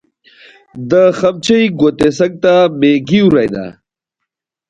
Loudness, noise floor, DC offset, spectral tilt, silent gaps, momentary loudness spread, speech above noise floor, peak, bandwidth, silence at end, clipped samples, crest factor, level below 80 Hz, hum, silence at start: -11 LUFS; -77 dBFS; under 0.1%; -6 dB/octave; none; 9 LU; 66 dB; 0 dBFS; 9.6 kHz; 1 s; under 0.1%; 12 dB; -48 dBFS; none; 0.75 s